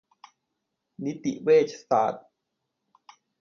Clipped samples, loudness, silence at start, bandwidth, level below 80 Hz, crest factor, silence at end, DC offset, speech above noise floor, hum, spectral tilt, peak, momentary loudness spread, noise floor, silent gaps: under 0.1%; -25 LUFS; 1 s; 7 kHz; -76 dBFS; 20 dB; 1.2 s; under 0.1%; 57 dB; none; -6 dB/octave; -10 dBFS; 14 LU; -81 dBFS; none